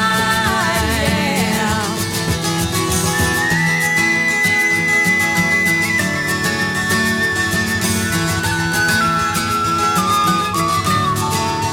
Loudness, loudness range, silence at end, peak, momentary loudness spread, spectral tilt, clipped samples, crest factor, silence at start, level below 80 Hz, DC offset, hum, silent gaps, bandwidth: -15 LUFS; 2 LU; 0 s; -2 dBFS; 4 LU; -3.5 dB/octave; under 0.1%; 14 dB; 0 s; -36 dBFS; under 0.1%; none; none; over 20 kHz